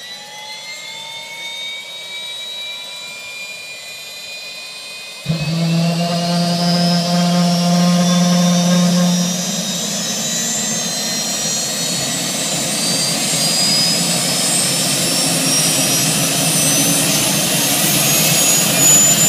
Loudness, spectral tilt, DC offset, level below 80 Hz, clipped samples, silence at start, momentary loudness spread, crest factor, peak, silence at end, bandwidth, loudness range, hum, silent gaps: -14 LUFS; -3 dB/octave; under 0.1%; -54 dBFS; under 0.1%; 0 s; 16 LU; 16 dB; 0 dBFS; 0 s; 16 kHz; 13 LU; none; none